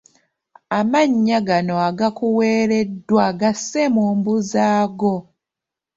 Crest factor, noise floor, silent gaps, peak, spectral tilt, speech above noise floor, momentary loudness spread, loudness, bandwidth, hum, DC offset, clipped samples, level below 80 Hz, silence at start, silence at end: 16 dB; -86 dBFS; none; -2 dBFS; -5.5 dB/octave; 68 dB; 5 LU; -18 LUFS; 7.8 kHz; none; under 0.1%; under 0.1%; -60 dBFS; 0.7 s; 0.75 s